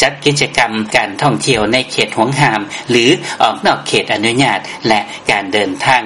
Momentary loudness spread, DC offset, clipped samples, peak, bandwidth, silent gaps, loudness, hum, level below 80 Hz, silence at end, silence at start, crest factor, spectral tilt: 3 LU; 0.1%; 0.1%; 0 dBFS; 12 kHz; none; -13 LUFS; none; -46 dBFS; 0 s; 0 s; 14 dB; -4 dB/octave